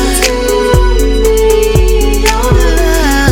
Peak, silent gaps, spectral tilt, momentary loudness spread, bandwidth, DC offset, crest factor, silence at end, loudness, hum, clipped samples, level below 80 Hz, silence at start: 0 dBFS; none; -4.5 dB/octave; 2 LU; 17.5 kHz; under 0.1%; 8 dB; 0 s; -10 LUFS; none; 0.3%; -12 dBFS; 0 s